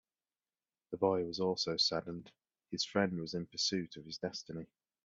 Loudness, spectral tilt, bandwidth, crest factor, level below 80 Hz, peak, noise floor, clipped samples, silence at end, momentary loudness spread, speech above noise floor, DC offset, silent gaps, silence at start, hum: -36 LUFS; -4 dB/octave; 7.8 kHz; 20 dB; -74 dBFS; -18 dBFS; under -90 dBFS; under 0.1%; 0.4 s; 15 LU; over 53 dB; under 0.1%; none; 0.9 s; none